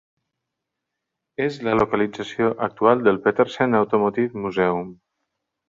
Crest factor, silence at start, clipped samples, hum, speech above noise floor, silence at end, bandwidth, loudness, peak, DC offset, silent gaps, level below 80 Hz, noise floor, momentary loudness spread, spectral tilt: 20 dB; 1.4 s; under 0.1%; none; 61 dB; 0.75 s; 7.4 kHz; -21 LUFS; -2 dBFS; under 0.1%; none; -56 dBFS; -82 dBFS; 8 LU; -7 dB/octave